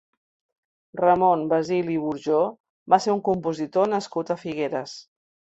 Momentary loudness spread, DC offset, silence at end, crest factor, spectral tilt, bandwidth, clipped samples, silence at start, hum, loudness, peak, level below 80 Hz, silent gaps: 9 LU; under 0.1%; 0.5 s; 20 dB; -6 dB/octave; 8.2 kHz; under 0.1%; 0.95 s; none; -23 LUFS; -4 dBFS; -66 dBFS; 2.60-2.64 s, 2.70-2.86 s